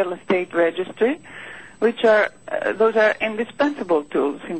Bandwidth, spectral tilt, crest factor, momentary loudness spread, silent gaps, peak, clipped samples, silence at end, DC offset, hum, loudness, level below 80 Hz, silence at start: 8.4 kHz; -5.5 dB/octave; 14 dB; 9 LU; none; -6 dBFS; under 0.1%; 0 s; 0.3%; none; -20 LUFS; -64 dBFS; 0 s